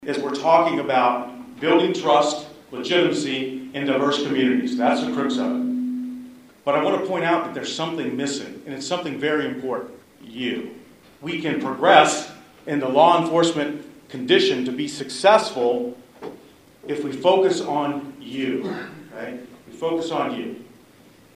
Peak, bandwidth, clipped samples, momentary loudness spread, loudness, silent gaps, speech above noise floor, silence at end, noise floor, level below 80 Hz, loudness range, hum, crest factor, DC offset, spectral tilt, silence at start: 0 dBFS; 15 kHz; under 0.1%; 18 LU; -21 LUFS; none; 30 dB; 0.7 s; -51 dBFS; -68 dBFS; 8 LU; none; 22 dB; under 0.1%; -4 dB/octave; 0 s